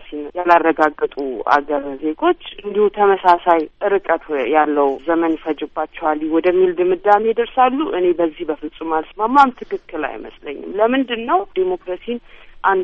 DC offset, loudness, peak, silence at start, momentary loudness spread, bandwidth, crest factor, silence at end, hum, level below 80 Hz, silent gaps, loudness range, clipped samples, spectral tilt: under 0.1%; -17 LUFS; 0 dBFS; 0 s; 12 LU; 7.4 kHz; 18 dB; 0 s; none; -48 dBFS; none; 2 LU; under 0.1%; -6.5 dB/octave